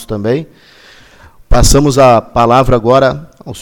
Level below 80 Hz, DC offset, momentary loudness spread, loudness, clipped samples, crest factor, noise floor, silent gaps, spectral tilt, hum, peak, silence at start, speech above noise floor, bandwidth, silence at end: -20 dBFS; under 0.1%; 10 LU; -10 LUFS; 0.3%; 10 dB; -40 dBFS; none; -5 dB/octave; none; 0 dBFS; 0 s; 30 dB; 18.5 kHz; 0 s